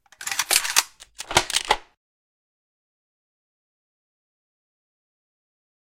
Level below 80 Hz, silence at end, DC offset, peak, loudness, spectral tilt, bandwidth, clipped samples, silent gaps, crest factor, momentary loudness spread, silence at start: -54 dBFS; 4.2 s; under 0.1%; 0 dBFS; -21 LUFS; 0 dB/octave; 17 kHz; under 0.1%; none; 30 dB; 12 LU; 0.2 s